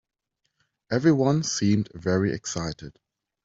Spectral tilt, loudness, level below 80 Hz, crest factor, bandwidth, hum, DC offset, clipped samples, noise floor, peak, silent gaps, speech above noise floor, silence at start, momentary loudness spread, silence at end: -5.5 dB/octave; -24 LUFS; -56 dBFS; 20 dB; 8 kHz; none; under 0.1%; under 0.1%; -74 dBFS; -6 dBFS; none; 50 dB; 0.9 s; 11 LU; 0.55 s